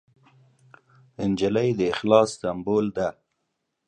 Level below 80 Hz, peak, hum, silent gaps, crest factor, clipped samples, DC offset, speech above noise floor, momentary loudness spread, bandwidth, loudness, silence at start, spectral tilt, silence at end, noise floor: -58 dBFS; -4 dBFS; none; none; 22 dB; under 0.1%; under 0.1%; 55 dB; 10 LU; 11 kHz; -24 LUFS; 1.2 s; -6 dB/octave; 0.75 s; -78 dBFS